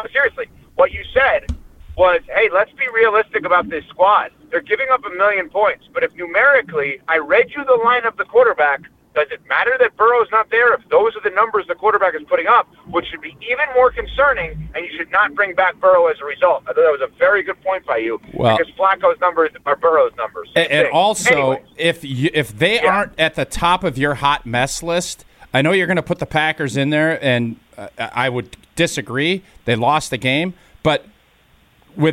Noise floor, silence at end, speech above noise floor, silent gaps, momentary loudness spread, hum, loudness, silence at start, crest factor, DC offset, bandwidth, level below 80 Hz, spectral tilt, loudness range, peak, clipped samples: -54 dBFS; 0 s; 37 dB; none; 9 LU; none; -16 LUFS; 0 s; 14 dB; under 0.1%; 14.5 kHz; -42 dBFS; -4.5 dB/octave; 4 LU; -2 dBFS; under 0.1%